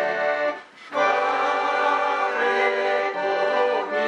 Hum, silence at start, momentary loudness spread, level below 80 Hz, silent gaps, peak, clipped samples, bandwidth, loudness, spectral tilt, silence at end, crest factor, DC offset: none; 0 s; 4 LU; -82 dBFS; none; -8 dBFS; under 0.1%; 9.4 kHz; -22 LUFS; -3 dB/octave; 0 s; 14 dB; under 0.1%